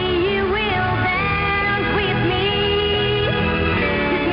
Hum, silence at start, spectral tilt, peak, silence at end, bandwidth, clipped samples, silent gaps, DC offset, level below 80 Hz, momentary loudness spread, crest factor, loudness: none; 0 s; -3 dB/octave; -8 dBFS; 0 s; 5.2 kHz; under 0.1%; none; under 0.1%; -34 dBFS; 1 LU; 12 dB; -18 LUFS